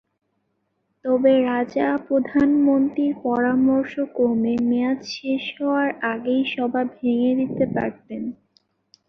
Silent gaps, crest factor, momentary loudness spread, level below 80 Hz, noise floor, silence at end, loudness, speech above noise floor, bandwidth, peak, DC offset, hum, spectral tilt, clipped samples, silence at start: none; 16 dB; 9 LU; -60 dBFS; -72 dBFS; 0.75 s; -21 LUFS; 52 dB; 6.4 kHz; -6 dBFS; under 0.1%; none; -6.5 dB/octave; under 0.1%; 1.05 s